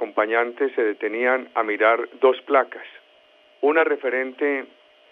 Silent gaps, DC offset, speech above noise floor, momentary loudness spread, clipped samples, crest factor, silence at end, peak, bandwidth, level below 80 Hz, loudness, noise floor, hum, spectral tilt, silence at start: none; under 0.1%; 34 dB; 6 LU; under 0.1%; 18 dB; 0.45 s; -4 dBFS; 4.2 kHz; -84 dBFS; -22 LUFS; -55 dBFS; none; -5.5 dB/octave; 0 s